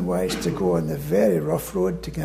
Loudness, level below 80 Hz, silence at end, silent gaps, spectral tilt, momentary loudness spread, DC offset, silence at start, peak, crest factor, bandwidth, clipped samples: -23 LUFS; -42 dBFS; 0 s; none; -6.5 dB/octave; 5 LU; under 0.1%; 0 s; -8 dBFS; 14 dB; 15.5 kHz; under 0.1%